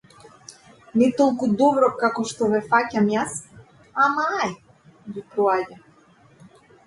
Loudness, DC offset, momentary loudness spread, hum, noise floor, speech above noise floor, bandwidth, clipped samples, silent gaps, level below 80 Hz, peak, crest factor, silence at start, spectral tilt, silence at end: -21 LUFS; under 0.1%; 15 LU; none; -54 dBFS; 34 dB; 11.5 kHz; under 0.1%; none; -64 dBFS; -4 dBFS; 20 dB; 0.5 s; -5 dB/octave; 1.1 s